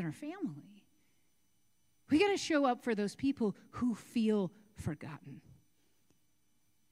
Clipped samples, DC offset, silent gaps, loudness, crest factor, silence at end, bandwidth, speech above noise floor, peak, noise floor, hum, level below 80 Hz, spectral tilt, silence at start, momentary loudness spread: under 0.1%; under 0.1%; none; -35 LUFS; 18 dB; 1.55 s; 15.5 kHz; 44 dB; -18 dBFS; -78 dBFS; none; -68 dBFS; -5.5 dB/octave; 0 s; 15 LU